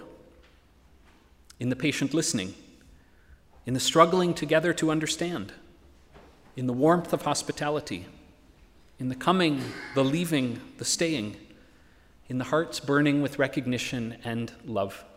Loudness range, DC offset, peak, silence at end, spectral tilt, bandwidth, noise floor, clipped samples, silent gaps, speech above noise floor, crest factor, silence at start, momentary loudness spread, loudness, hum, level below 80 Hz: 4 LU; under 0.1%; -4 dBFS; 0.1 s; -4.5 dB/octave; 16 kHz; -58 dBFS; under 0.1%; none; 31 dB; 24 dB; 0 s; 12 LU; -27 LUFS; none; -60 dBFS